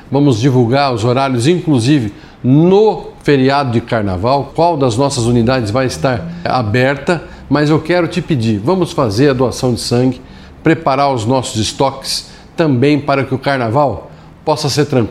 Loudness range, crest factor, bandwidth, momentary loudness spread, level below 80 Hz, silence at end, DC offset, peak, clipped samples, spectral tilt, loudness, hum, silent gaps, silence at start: 3 LU; 12 dB; 13.5 kHz; 6 LU; -40 dBFS; 0 s; under 0.1%; 0 dBFS; under 0.1%; -6 dB/octave; -13 LUFS; none; none; 0.05 s